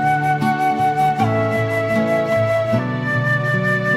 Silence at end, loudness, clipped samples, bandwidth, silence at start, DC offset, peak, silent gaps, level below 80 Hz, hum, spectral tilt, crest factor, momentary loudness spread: 0 s; -18 LUFS; under 0.1%; 15 kHz; 0 s; under 0.1%; -4 dBFS; none; -52 dBFS; none; -7 dB/octave; 12 dB; 2 LU